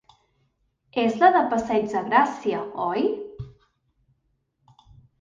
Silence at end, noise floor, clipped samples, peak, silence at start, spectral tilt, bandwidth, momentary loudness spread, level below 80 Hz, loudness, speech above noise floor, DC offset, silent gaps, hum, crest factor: 1.7 s; -72 dBFS; under 0.1%; -4 dBFS; 0.95 s; -5.5 dB/octave; 7.6 kHz; 17 LU; -60 dBFS; -23 LUFS; 50 dB; under 0.1%; none; none; 20 dB